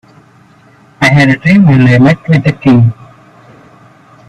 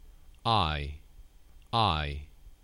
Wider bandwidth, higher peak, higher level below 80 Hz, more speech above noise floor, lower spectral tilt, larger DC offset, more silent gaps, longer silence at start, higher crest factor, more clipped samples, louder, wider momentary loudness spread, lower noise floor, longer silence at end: about the same, 11 kHz vs 11.5 kHz; first, 0 dBFS vs -12 dBFS; about the same, -42 dBFS vs -44 dBFS; first, 36 dB vs 25 dB; first, -7.5 dB/octave vs -6 dB/octave; neither; neither; first, 1 s vs 0.05 s; second, 10 dB vs 20 dB; neither; first, -8 LUFS vs -30 LUFS; second, 5 LU vs 16 LU; second, -42 dBFS vs -53 dBFS; first, 1.35 s vs 0.1 s